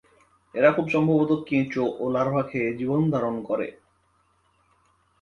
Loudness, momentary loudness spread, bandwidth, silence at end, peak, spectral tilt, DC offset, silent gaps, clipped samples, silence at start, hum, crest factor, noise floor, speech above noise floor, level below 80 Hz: -24 LUFS; 8 LU; 7 kHz; 1.5 s; -6 dBFS; -8.5 dB/octave; under 0.1%; none; under 0.1%; 0.55 s; none; 20 dB; -66 dBFS; 43 dB; -62 dBFS